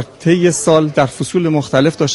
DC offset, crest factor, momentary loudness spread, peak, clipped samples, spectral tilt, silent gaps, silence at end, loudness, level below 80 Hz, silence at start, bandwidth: under 0.1%; 14 dB; 4 LU; 0 dBFS; under 0.1%; -5.5 dB/octave; none; 0 s; -14 LUFS; -50 dBFS; 0 s; 11.5 kHz